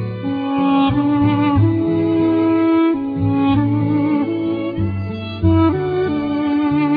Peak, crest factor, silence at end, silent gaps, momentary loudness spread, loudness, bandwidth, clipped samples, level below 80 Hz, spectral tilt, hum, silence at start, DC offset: -2 dBFS; 14 dB; 0 s; none; 6 LU; -17 LUFS; 5 kHz; under 0.1%; -40 dBFS; -11 dB/octave; none; 0 s; under 0.1%